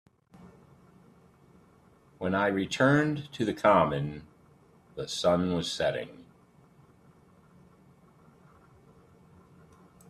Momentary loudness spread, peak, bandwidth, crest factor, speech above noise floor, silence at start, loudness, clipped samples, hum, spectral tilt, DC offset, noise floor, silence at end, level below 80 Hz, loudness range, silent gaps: 16 LU; -10 dBFS; 13.5 kHz; 22 dB; 33 dB; 0.45 s; -28 LUFS; under 0.1%; none; -5.5 dB/octave; under 0.1%; -60 dBFS; 3.85 s; -62 dBFS; 7 LU; none